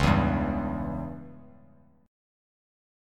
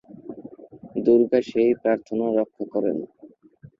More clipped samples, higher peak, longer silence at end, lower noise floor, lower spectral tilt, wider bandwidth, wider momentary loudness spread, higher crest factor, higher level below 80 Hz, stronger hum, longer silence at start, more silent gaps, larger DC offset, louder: neither; about the same, -8 dBFS vs -6 dBFS; first, 1.65 s vs 0.55 s; first, -58 dBFS vs -50 dBFS; about the same, -7 dB/octave vs -8 dB/octave; first, 13 kHz vs 7.2 kHz; second, 19 LU vs 22 LU; about the same, 22 dB vs 18 dB; first, -40 dBFS vs -66 dBFS; neither; second, 0 s vs 0.15 s; neither; neither; second, -29 LUFS vs -22 LUFS